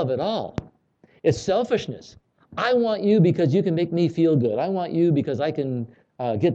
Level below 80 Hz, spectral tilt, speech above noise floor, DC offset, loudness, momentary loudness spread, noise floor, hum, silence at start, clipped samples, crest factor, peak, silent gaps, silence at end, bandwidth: -56 dBFS; -7.5 dB/octave; 37 dB; under 0.1%; -22 LUFS; 13 LU; -59 dBFS; none; 0 s; under 0.1%; 16 dB; -6 dBFS; none; 0 s; 8 kHz